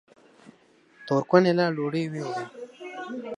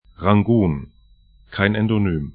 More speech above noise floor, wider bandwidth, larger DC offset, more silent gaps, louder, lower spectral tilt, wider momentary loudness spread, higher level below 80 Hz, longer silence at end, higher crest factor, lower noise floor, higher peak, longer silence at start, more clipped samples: about the same, 34 dB vs 34 dB; first, 10.5 kHz vs 4.6 kHz; neither; neither; second, -25 LUFS vs -19 LUFS; second, -7 dB/octave vs -12.5 dB/octave; first, 19 LU vs 10 LU; second, -76 dBFS vs -40 dBFS; about the same, 0 s vs 0.05 s; about the same, 24 dB vs 20 dB; first, -59 dBFS vs -52 dBFS; second, -4 dBFS vs 0 dBFS; first, 0.45 s vs 0.2 s; neither